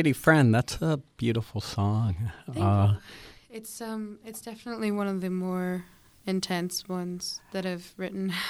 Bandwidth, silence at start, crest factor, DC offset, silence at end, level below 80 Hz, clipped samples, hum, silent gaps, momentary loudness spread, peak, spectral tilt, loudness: 15.5 kHz; 0 s; 22 dB; under 0.1%; 0 s; -54 dBFS; under 0.1%; none; none; 16 LU; -6 dBFS; -6 dB/octave; -28 LUFS